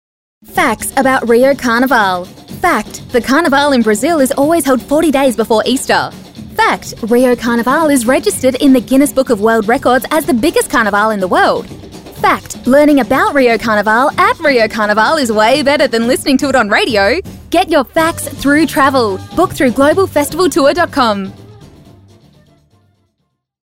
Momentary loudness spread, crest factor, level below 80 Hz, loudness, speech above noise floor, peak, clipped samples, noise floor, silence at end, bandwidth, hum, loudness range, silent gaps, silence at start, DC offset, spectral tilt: 6 LU; 12 dB; -40 dBFS; -11 LUFS; 56 dB; 0 dBFS; under 0.1%; -67 dBFS; 2.1 s; 16 kHz; none; 2 LU; none; 0.5 s; 0.3%; -4 dB/octave